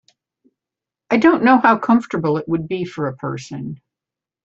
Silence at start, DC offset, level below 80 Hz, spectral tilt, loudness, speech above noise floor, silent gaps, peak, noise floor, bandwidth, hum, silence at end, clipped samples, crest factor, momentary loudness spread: 1.1 s; under 0.1%; -58 dBFS; -7 dB/octave; -17 LUFS; 71 dB; none; -2 dBFS; -88 dBFS; 7.8 kHz; none; 0.7 s; under 0.1%; 18 dB; 17 LU